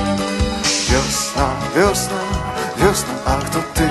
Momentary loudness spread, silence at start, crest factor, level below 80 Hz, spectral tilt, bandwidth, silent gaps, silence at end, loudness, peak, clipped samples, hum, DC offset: 6 LU; 0 s; 16 dB; -28 dBFS; -4 dB/octave; 12.5 kHz; none; 0 s; -18 LUFS; -2 dBFS; under 0.1%; none; under 0.1%